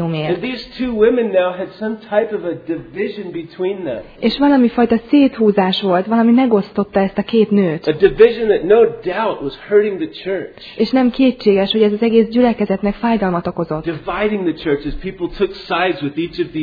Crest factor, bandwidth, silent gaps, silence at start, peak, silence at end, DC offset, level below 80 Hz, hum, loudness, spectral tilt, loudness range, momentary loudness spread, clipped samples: 16 dB; 5 kHz; none; 0 s; 0 dBFS; 0 s; under 0.1%; -42 dBFS; none; -16 LUFS; -8.5 dB/octave; 5 LU; 11 LU; under 0.1%